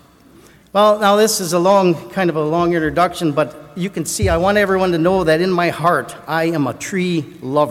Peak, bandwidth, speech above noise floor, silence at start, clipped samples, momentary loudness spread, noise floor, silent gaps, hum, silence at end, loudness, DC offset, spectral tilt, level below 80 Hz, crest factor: -2 dBFS; 16.5 kHz; 30 dB; 0.75 s; under 0.1%; 8 LU; -46 dBFS; none; none; 0 s; -16 LUFS; under 0.1%; -5 dB/octave; -40 dBFS; 14 dB